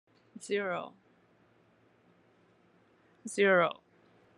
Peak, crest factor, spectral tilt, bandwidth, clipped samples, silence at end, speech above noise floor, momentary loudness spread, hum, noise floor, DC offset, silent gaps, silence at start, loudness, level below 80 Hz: -14 dBFS; 22 dB; -4.5 dB/octave; 10.5 kHz; under 0.1%; 0.65 s; 37 dB; 24 LU; none; -67 dBFS; under 0.1%; none; 0.35 s; -30 LUFS; -88 dBFS